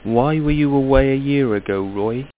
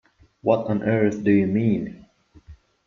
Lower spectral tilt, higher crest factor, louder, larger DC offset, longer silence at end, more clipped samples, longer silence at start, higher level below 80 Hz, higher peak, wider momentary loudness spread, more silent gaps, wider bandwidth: first, -12 dB/octave vs -9 dB/octave; about the same, 16 dB vs 18 dB; first, -18 LUFS vs -22 LUFS; neither; second, 0.1 s vs 0.35 s; neither; second, 0.05 s vs 0.45 s; first, -30 dBFS vs -56 dBFS; first, 0 dBFS vs -4 dBFS; about the same, 7 LU vs 8 LU; neither; second, 4 kHz vs 7.2 kHz